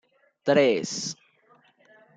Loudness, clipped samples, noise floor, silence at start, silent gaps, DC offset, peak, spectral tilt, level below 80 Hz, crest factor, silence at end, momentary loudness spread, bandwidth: -24 LUFS; under 0.1%; -61 dBFS; 0.45 s; none; under 0.1%; -8 dBFS; -4 dB/octave; -76 dBFS; 20 dB; 1.05 s; 14 LU; 9.4 kHz